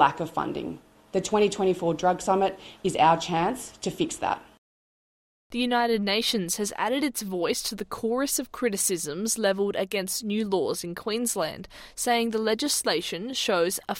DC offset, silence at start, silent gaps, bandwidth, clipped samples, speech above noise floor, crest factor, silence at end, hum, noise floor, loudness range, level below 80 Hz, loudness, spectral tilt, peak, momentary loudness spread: under 0.1%; 0 s; 4.58-5.50 s; 16.5 kHz; under 0.1%; over 64 dB; 20 dB; 0 s; none; under -90 dBFS; 3 LU; -60 dBFS; -26 LUFS; -3 dB/octave; -6 dBFS; 8 LU